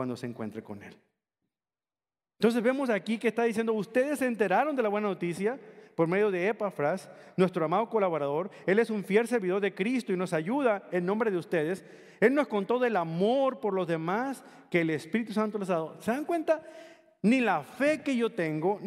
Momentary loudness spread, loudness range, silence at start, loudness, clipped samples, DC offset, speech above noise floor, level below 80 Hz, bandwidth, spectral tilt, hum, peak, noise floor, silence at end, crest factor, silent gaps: 7 LU; 3 LU; 0 s; -29 LUFS; under 0.1%; under 0.1%; over 61 dB; -80 dBFS; 14.5 kHz; -6.5 dB/octave; none; -8 dBFS; under -90 dBFS; 0 s; 20 dB; none